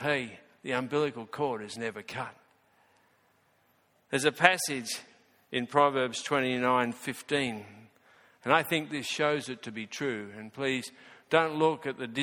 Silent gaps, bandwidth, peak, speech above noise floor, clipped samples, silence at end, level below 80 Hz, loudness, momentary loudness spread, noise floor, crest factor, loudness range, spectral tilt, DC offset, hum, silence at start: none; 17.5 kHz; -2 dBFS; 39 dB; under 0.1%; 0 s; -72 dBFS; -30 LUFS; 14 LU; -69 dBFS; 30 dB; 8 LU; -4 dB/octave; under 0.1%; none; 0 s